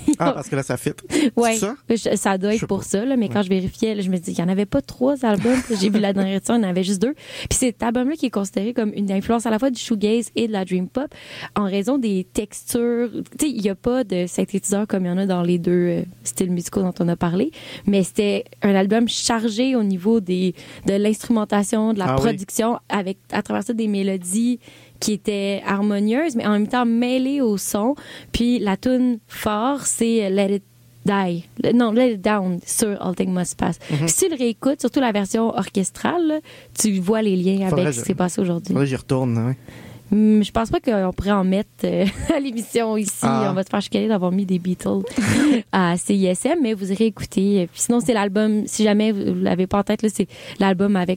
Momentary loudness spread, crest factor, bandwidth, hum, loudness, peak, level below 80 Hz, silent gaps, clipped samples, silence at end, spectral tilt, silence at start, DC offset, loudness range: 6 LU; 14 dB; 16.5 kHz; none; -21 LUFS; -6 dBFS; -46 dBFS; none; under 0.1%; 0 s; -5 dB/octave; 0 s; under 0.1%; 3 LU